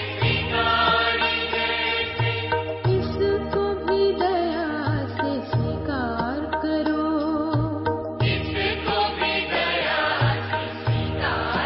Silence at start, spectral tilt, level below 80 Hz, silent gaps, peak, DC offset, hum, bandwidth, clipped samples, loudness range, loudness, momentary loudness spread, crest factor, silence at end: 0 s; -10.5 dB/octave; -40 dBFS; none; -8 dBFS; under 0.1%; none; 5.8 kHz; under 0.1%; 3 LU; -23 LUFS; 5 LU; 16 dB; 0 s